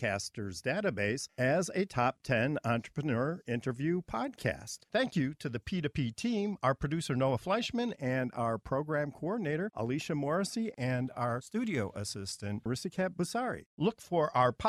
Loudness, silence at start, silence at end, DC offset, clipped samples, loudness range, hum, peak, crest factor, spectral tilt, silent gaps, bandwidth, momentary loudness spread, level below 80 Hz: -34 LUFS; 0 s; 0 s; under 0.1%; under 0.1%; 2 LU; none; -14 dBFS; 18 dB; -5.5 dB/octave; 13.66-13.77 s; 14.5 kHz; 6 LU; -60 dBFS